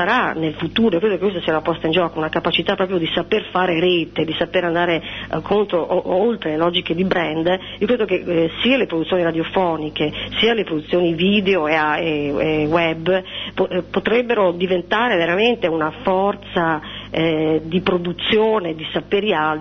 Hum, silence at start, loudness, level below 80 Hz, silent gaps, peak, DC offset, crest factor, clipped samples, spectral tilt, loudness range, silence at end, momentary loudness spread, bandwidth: none; 0 s; -19 LUFS; -46 dBFS; none; -4 dBFS; under 0.1%; 16 dB; under 0.1%; -7 dB/octave; 1 LU; 0 s; 5 LU; 6.4 kHz